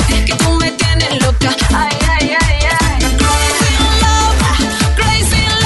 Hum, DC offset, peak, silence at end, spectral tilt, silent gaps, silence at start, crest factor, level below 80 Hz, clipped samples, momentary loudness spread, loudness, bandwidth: none; under 0.1%; 0 dBFS; 0 s; -3.5 dB/octave; none; 0 s; 12 dB; -16 dBFS; under 0.1%; 2 LU; -12 LUFS; 12 kHz